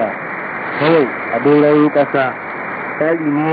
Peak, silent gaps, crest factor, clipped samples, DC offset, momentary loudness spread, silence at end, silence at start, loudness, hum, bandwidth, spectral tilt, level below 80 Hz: 0 dBFS; none; 14 dB; under 0.1%; under 0.1%; 11 LU; 0 s; 0 s; -15 LUFS; none; 4.9 kHz; -12 dB/octave; -62 dBFS